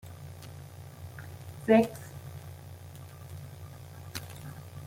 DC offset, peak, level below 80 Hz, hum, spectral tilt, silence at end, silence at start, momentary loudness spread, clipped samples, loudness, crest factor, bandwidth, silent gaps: under 0.1%; -10 dBFS; -64 dBFS; none; -6.5 dB/octave; 0 s; 0 s; 23 LU; under 0.1%; -29 LUFS; 26 dB; 16.5 kHz; none